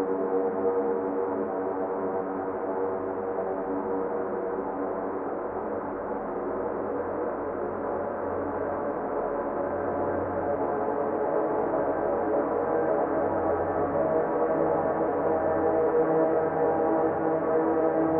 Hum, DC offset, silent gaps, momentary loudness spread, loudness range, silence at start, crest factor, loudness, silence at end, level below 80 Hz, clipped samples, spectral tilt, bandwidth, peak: none; under 0.1%; none; 6 LU; 6 LU; 0 s; 16 dB; -28 LUFS; 0 s; -58 dBFS; under 0.1%; -11 dB/octave; 3.1 kHz; -12 dBFS